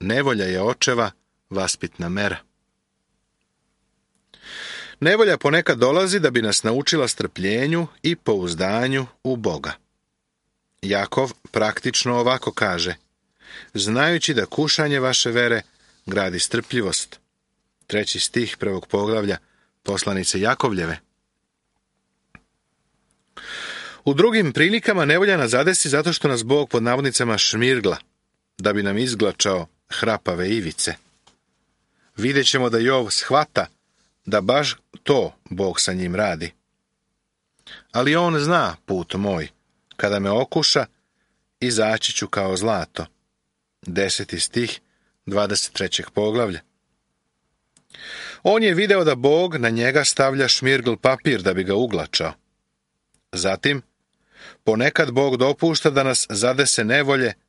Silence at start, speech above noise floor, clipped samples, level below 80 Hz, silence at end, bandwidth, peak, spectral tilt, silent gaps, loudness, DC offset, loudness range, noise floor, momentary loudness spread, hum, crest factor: 0 s; 55 dB; under 0.1%; -56 dBFS; 0.15 s; 11.5 kHz; -2 dBFS; -3.5 dB/octave; none; -20 LUFS; under 0.1%; 7 LU; -76 dBFS; 13 LU; none; 20 dB